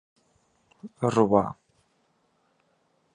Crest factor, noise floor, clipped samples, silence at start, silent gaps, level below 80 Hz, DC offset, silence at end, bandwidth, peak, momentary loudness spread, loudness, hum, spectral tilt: 24 dB; -69 dBFS; under 0.1%; 0.85 s; none; -62 dBFS; under 0.1%; 1.6 s; 11 kHz; -6 dBFS; 26 LU; -24 LUFS; none; -7.5 dB/octave